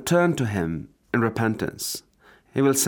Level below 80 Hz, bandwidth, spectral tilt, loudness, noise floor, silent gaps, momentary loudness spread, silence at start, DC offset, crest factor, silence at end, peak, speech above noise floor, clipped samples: -56 dBFS; over 20 kHz; -4.5 dB/octave; -25 LUFS; -56 dBFS; none; 11 LU; 0 s; under 0.1%; 16 dB; 0 s; -8 dBFS; 33 dB; under 0.1%